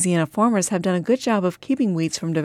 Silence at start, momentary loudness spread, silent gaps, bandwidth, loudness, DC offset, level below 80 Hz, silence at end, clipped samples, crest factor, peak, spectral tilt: 0 s; 4 LU; none; 14.5 kHz; -21 LUFS; under 0.1%; -64 dBFS; 0 s; under 0.1%; 14 dB; -8 dBFS; -5 dB/octave